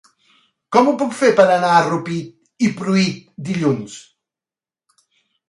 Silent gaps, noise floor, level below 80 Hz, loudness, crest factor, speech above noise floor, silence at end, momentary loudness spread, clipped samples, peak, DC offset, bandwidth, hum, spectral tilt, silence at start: none; under -90 dBFS; -64 dBFS; -17 LUFS; 18 dB; over 74 dB; 1.5 s; 16 LU; under 0.1%; 0 dBFS; under 0.1%; 11.5 kHz; none; -5.5 dB/octave; 0.7 s